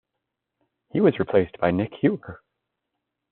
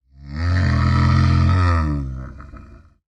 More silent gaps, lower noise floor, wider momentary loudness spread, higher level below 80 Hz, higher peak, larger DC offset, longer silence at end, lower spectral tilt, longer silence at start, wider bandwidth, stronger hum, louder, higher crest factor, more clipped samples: neither; first, -82 dBFS vs -43 dBFS; second, 11 LU vs 18 LU; second, -60 dBFS vs -32 dBFS; about the same, -6 dBFS vs -6 dBFS; neither; first, 0.95 s vs 0.55 s; about the same, -7 dB/octave vs -7.5 dB/octave; first, 0.95 s vs 0.25 s; second, 4.3 kHz vs 7.6 kHz; neither; second, -23 LUFS vs -18 LUFS; first, 20 dB vs 12 dB; neither